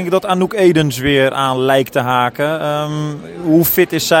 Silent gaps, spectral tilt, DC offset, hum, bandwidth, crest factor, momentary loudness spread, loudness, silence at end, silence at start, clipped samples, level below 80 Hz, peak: none; -5 dB/octave; under 0.1%; none; 17 kHz; 14 dB; 7 LU; -14 LUFS; 0 s; 0 s; under 0.1%; -46 dBFS; 0 dBFS